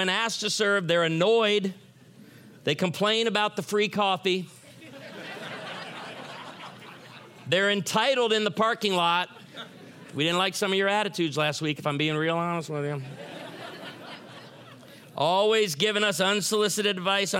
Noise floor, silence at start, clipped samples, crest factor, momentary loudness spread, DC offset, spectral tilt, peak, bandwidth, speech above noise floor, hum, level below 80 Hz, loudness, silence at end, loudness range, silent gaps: -51 dBFS; 0 s; under 0.1%; 18 dB; 19 LU; under 0.1%; -3.5 dB/octave; -8 dBFS; 16.5 kHz; 26 dB; none; -78 dBFS; -25 LUFS; 0 s; 6 LU; none